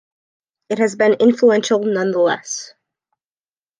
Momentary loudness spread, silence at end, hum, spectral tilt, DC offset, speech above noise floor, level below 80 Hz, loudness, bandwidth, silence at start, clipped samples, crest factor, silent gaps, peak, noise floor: 13 LU; 1.15 s; none; -4.5 dB/octave; under 0.1%; over 74 dB; -72 dBFS; -16 LUFS; 10 kHz; 0.7 s; under 0.1%; 16 dB; none; -2 dBFS; under -90 dBFS